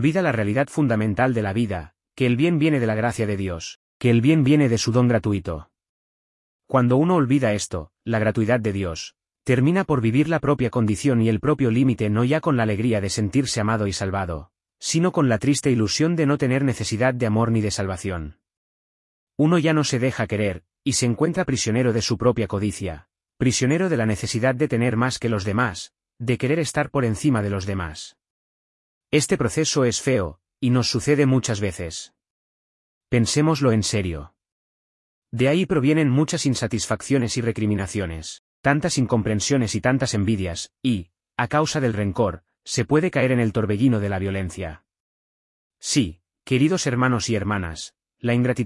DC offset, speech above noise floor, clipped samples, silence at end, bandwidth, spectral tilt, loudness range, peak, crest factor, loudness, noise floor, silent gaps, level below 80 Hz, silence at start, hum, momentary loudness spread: under 0.1%; over 69 dB; under 0.1%; 0 s; 12 kHz; -5.5 dB/octave; 3 LU; -4 dBFS; 18 dB; -22 LUFS; under -90 dBFS; 3.76-4.00 s, 5.89-6.60 s, 18.57-19.27 s, 28.30-29.01 s, 32.30-33.01 s, 34.52-35.22 s, 38.39-38.64 s, 45.00-45.71 s; -50 dBFS; 0 s; none; 11 LU